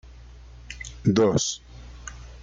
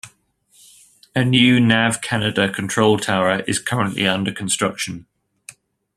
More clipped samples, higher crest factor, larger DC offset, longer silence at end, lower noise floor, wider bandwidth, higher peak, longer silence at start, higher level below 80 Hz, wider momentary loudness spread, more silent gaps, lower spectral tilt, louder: neither; about the same, 18 dB vs 18 dB; neither; second, 0 s vs 0.45 s; second, -45 dBFS vs -58 dBFS; second, 9.6 kHz vs 13.5 kHz; second, -8 dBFS vs -2 dBFS; about the same, 0.05 s vs 0.05 s; first, -44 dBFS vs -56 dBFS; first, 21 LU vs 9 LU; neither; about the same, -5 dB/octave vs -4 dB/octave; second, -23 LUFS vs -18 LUFS